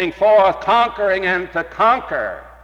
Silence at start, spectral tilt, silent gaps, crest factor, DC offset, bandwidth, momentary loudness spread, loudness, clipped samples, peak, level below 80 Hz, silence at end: 0 s; -5.5 dB/octave; none; 12 dB; under 0.1%; 8 kHz; 11 LU; -16 LUFS; under 0.1%; -6 dBFS; -46 dBFS; 0.1 s